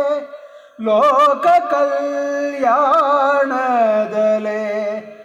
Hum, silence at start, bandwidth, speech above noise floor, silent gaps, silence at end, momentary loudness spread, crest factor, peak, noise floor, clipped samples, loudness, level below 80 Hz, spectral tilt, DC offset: none; 0 s; 10.5 kHz; 23 dB; none; 0 s; 9 LU; 10 dB; -6 dBFS; -38 dBFS; under 0.1%; -16 LUFS; -64 dBFS; -5 dB/octave; under 0.1%